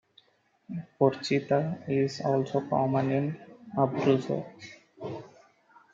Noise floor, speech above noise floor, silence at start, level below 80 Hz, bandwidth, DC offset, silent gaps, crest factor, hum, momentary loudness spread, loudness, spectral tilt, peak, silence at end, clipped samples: -68 dBFS; 40 dB; 0.7 s; -74 dBFS; 7.6 kHz; under 0.1%; none; 20 dB; none; 17 LU; -28 LUFS; -7 dB/octave; -10 dBFS; 0.65 s; under 0.1%